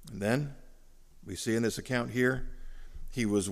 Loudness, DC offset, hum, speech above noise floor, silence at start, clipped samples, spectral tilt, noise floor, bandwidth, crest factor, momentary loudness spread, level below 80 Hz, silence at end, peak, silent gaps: -32 LUFS; under 0.1%; none; 23 dB; 0 s; under 0.1%; -5 dB/octave; -54 dBFS; 15.5 kHz; 18 dB; 23 LU; -46 dBFS; 0 s; -14 dBFS; none